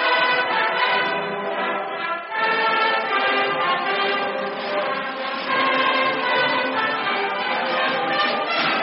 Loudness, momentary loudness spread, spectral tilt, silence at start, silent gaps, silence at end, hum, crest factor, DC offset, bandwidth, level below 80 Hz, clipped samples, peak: -21 LUFS; 7 LU; 0.5 dB/octave; 0 s; none; 0 s; none; 14 dB; under 0.1%; 5.8 kHz; -74 dBFS; under 0.1%; -6 dBFS